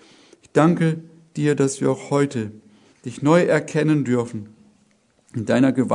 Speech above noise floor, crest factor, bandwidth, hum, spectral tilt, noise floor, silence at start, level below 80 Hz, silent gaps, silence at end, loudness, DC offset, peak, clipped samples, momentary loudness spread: 41 dB; 20 dB; 11 kHz; none; -6.5 dB/octave; -61 dBFS; 0.55 s; -64 dBFS; none; 0 s; -20 LUFS; under 0.1%; -2 dBFS; under 0.1%; 17 LU